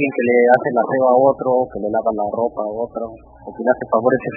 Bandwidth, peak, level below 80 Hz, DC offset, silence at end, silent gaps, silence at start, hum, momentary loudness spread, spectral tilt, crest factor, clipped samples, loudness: 3.9 kHz; 0 dBFS; -52 dBFS; under 0.1%; 0 s; none; 0 s; none; 13 LU; -10.5 dB/octave; 18 dB; under 0.1%; -17 LUFS